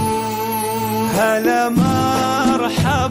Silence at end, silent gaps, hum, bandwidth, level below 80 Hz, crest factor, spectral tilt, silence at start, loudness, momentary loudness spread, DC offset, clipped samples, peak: 0 s; none; none; 16.5 kHz; -40 dBFS; 12 dB; -5 dB/octave; 0 s; -17 LUFS; 5 LU; under 0.1%; under 0.1%; -6 dBFS